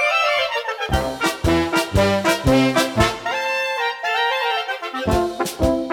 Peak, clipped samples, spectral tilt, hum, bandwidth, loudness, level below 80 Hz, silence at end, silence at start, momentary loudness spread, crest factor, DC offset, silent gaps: -4 dBFS; under 0.1%; -4.5 dB/octave; none; 19.5 kHz; -19 LUFS; -34 dBFS; 0 s; 0 s; 6 LU; 16 dB; under 0.1%; none